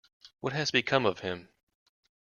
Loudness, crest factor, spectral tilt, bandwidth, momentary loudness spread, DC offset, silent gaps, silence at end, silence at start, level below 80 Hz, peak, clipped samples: -29 LUFS; 24 dB; -4 dB/octave; 7.2 kHz; 12 LU; under 0.1%; none; 0.9 s; 0.25 s; -68 dBFS; -10 dBFS; under 0.1%